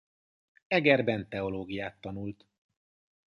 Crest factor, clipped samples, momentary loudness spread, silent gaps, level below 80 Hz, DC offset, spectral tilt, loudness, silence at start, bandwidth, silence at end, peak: 24 dB; under 0.1%; 15 LU; none; -62 dBFS; under 0.1%; -7.5 dB/octave; -30 LUFS; 0.7 s; 10.5 kHz; 0.95 s; -10 dBFS